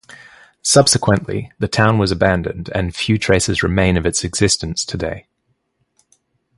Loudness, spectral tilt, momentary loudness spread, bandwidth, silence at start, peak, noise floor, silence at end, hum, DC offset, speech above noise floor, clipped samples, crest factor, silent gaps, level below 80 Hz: -16 LUFS; -4 dB/octave; 10 LU; 11.5 kHz; 0.1 s; 0 dBFS; -68 dBFS; 1.35 s; none; under 0.1%; 51 dB; under 0.1%; 18 dB; none; -34 dBFS